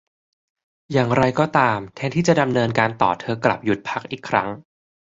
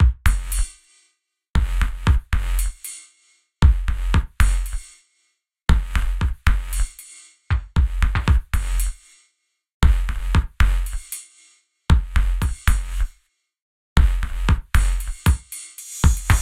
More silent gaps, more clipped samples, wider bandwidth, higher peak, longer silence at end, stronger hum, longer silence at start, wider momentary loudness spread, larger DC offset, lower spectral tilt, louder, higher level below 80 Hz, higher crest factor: second, none vs 1.50-1.54 s, 9.74-9.80 s, 13.62-13.96 s; neither; second, 7.8 kHz vs 15.5 kHz; about the same, -2 dBFS vs -2 dBFS; first, 0.5 s vs 0 s; neither; first, 0.9 s vs 0 s; second, 8 LU vs 12 LU; neither; about the same, -6 dB/octave vs -5 dB/octave; first, -20 LUFS vs -23 LUFS; second, -54 dBFS vs -20 dBFS; about the same, 20 dB vs 18 dB